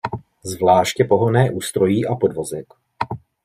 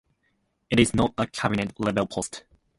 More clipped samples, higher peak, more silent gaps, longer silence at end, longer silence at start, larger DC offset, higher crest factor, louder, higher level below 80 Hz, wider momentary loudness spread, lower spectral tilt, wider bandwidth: neither; about the same, -2 dBFS vs -4 dBFS; neither; about the same, 0.3 s vs 0.4 s; second, 0.05 s vs 0.7 s; neither; about the same, 18 dB vs 22 dB; first, -19 LUFS vs -25 LUFS; second, -56 dBFS vs -48 dBFS; first, 14 LU vs 11 LU; about the same, -6 dB/octave vs -5 dB/octave; first, 16 kHz vs 11.5 kHz